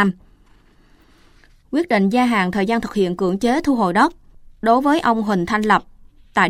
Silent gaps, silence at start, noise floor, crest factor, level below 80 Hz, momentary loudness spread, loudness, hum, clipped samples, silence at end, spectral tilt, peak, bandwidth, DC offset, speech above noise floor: none; 0 s; -52 dBFS; 16 dB; -46 dBFS; 7 LU; -18 LUFS; none; under 0.1%; 0 s; -6 dB/octave; -2 dBFS; 15 kHz; under 0.1%; 35 dB